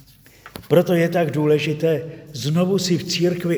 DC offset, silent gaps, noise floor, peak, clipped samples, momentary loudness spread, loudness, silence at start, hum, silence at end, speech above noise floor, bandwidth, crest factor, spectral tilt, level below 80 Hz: under 0.1%; none; -46 dBFS; -2 dBFS; under 0.1%; 11 LU; -20 LUFS; 0.45 s; none; 0 s; 27 dB; over 20 kHz; 18 dB; -6 dB/octave; -58 dBFS